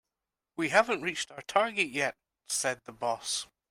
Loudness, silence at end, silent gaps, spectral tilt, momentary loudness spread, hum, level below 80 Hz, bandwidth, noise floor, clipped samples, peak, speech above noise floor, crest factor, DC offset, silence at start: -30 LUFS; 0.25 s; none; -2 dB/octave; 9 LU; none; -72 dBFS; 16 kHz; -89 dBFS; under 0.1%; -8 dBFS; 59 dB; 24 dB; under 0.1%; 0.6 s